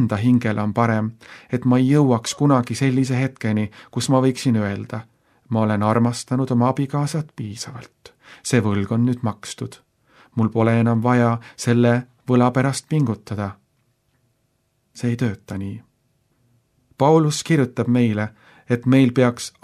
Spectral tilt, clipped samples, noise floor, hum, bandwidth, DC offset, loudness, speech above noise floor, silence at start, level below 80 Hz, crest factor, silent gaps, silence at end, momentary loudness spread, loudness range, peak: -6.5 dB/octave; under 0.1%; -68 dBFS; none; 13 kHz; under 0.1%; -20 LUFS; 48 dB; 0 s; -60 dBFS; 18 dB; none; 0.15 s; 14 LU; 6 LU; -2 dBFS